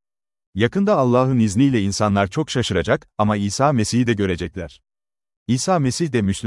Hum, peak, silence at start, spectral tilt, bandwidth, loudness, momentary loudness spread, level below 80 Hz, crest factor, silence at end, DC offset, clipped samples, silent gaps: none; -2 dBFS; 0.55 s; -5.5 dB/octave; 12 kHz; -19 LUFS; 9 LU; -50 dBFS; 18 dB; 0 s; under 0.1%; under 0.1%; 5.37-5.46 s